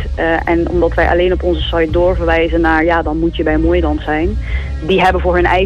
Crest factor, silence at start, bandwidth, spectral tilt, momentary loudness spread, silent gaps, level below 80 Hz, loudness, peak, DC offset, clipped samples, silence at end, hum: 12 dB; 0 s; 8.2 kHz; -7.5 dB/octave; 5 LU; none; -20 dBFS; -14 LUFS; -2 dBFS; under 0.1%; under 0.1%; 0 s; none